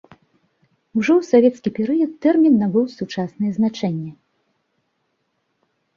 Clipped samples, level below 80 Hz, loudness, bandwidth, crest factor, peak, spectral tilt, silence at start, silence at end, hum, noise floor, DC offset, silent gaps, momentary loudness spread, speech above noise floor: under 0.1%; -64 dBFS; -19 LUFS; 7.2 kHz; 18 dB; -2 dBFS; -7.5 dB/octave; 0.95 s; 1.85 s; none; -71 dBFS; under 0.1%; none; 12 LU; 53 dB